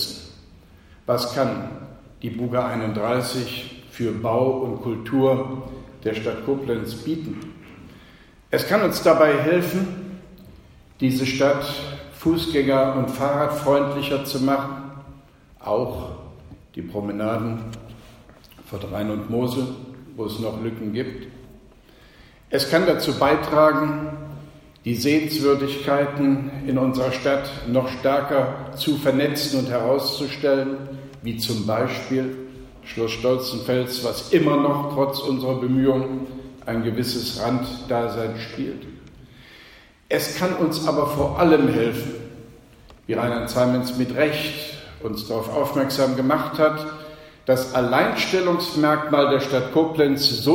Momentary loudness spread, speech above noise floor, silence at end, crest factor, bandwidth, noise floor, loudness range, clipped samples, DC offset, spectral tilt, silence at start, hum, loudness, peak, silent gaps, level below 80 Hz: 16 LU; 28 dB; 0 s; 20 dB; 16.5 kHz; -50 dBFS; 7 LU; under 0.1%; under 0.1%; -5.5 dB/octave; 0 s; none; -22 LUFS; -4 dBFS; none; -50 dBFS